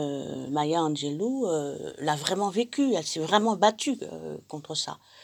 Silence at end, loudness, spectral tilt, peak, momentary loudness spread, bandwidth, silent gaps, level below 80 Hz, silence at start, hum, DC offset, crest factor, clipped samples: 0.05 s; -27 LUFS; -4 dB/octave; -4 dBFS; 11 LU; 19.5 kHz; none; -72 dBFS; 0 s; none; under 0.1%; 22 dB; under 0.1%